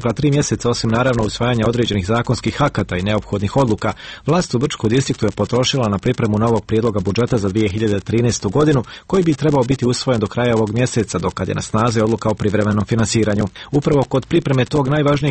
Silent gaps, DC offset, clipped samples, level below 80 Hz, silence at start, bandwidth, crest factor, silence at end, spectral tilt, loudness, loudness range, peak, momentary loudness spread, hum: none; under 0.1%; under 0.1%; -40 dBFS; 0 s; 8.8 kHz; 14 dB; 0 s; -6 dB/octave; -17 LUFS; 1 LU; -2 dBFS; 4 LU; none